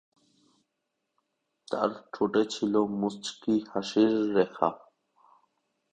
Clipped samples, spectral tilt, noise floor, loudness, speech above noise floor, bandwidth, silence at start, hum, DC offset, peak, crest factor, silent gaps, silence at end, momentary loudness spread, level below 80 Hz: under 0.1%; -5.5 dB/octave; -82 dBFS; -28 LUFS; 55 dB; 9.2 kHz; 1.7 s; none; under 0.1%; -8 dBFS; 24 dB; none; 1.15 s; 8 LU; -70 dBFS